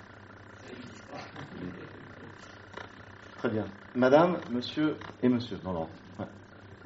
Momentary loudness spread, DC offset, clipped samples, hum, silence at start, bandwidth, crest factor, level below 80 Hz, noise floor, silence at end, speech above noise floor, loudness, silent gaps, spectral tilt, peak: 24 LU; under 0.1%; under 0.1%; none; 0 s; 7.6 kHz; 24 dB; -64 dBFS; -50 dBFS; 0 s; 20 dB; -30 LUFS; none; -5 dB/octave; -8 dBFS